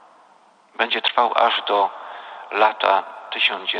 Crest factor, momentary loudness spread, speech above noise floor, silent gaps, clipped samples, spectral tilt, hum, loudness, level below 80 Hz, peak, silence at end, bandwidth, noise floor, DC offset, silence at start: 18 dB; 14 LU; 34 dB; none; under 0.1%; -2.5 dB/octave; none; -20 LUFS; -74 dBFS; -2 dBFS; 0 s; 9.8 kHz; -54 dBFS; under 0.1%; 0.8 s